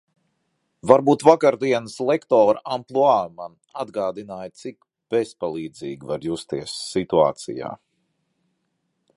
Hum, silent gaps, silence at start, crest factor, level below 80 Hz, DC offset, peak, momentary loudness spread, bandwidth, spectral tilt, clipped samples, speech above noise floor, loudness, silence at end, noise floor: none; none; 0.85 s; 22 dB; -62 dBFS; under 0.1%; 0 dBFS; 18 LU; 11.5 kHz; -5.5 dB/octave; under 0.1%; 53 dB; -21 LUFS; 1.4 s; -74 dBFS